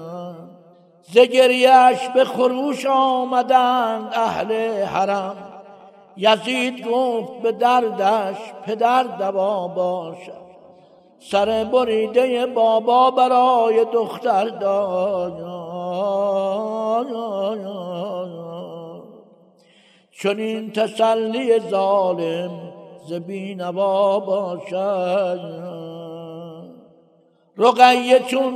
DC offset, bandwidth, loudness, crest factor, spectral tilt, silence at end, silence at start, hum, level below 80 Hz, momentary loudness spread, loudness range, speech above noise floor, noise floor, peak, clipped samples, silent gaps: under 0.1%; 14 kHz; -19 LUFS; 20 dB; -5 dB/octave; 0 s; 0 s; none; -66 dBFS; 18 LU; 8 LU; 39 dB; -57 dBFS; 0 dBFS; under 0.1%; none